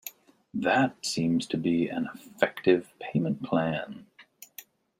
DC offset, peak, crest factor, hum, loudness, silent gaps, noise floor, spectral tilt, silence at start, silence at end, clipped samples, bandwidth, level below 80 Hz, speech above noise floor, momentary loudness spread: under 0.1%; -6 dBFS; 24 dB; none; -28 LUFS; none; -54 dBFS; -5.5 dB/octave; 0.05 s; 0.4 s; under 0.1%; 16 kHz; -68 dBFS; 27 dB; 20 LU